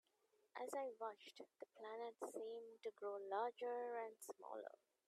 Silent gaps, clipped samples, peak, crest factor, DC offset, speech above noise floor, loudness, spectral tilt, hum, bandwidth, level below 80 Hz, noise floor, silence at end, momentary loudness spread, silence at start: none; under 0.1%; -32 dBFS; 20 dB; under 0.1%; 32 dB; -51 LUFS; -2 dB/octave; none; 13.5 kHz; under -90 dBFS; -82 dBFS; 0.35 s; 14 LU; 0.55 s